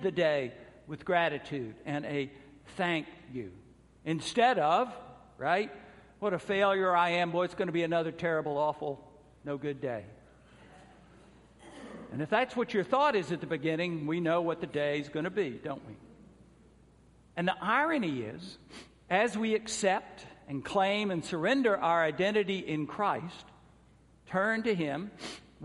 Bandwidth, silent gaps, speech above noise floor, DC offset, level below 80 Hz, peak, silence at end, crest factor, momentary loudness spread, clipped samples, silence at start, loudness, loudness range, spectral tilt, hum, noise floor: 11.5 kHz; none; 30 dB; under 0.1%; -66 dBFS; -12 dBFS; 0 s; 20 dB; 16 LU; under 0.1%; 0 s; -31 LUFS; 6 LU; -5 dB/octave; none; -61 dBFS